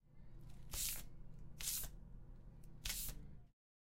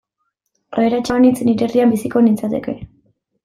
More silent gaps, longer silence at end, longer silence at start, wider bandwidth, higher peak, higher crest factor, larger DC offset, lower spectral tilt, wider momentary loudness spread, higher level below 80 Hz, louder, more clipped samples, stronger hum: neither; second, 0.3 s vs 0.6 s; second, 0.05 s vs 0.7 s; about the same, 16 kHz vs 15 kHz; second, -24 dBFS vs -2 dBFS; first, 24 dB vs 14 dB; neither; second, -1 dB/octave vs -6.5 dB/octave; first, 19 LU vs 11 LU; second, -56 dBFS vs -50 dBFS; second, -45 LUFS vs -16 LUFS; neither; neither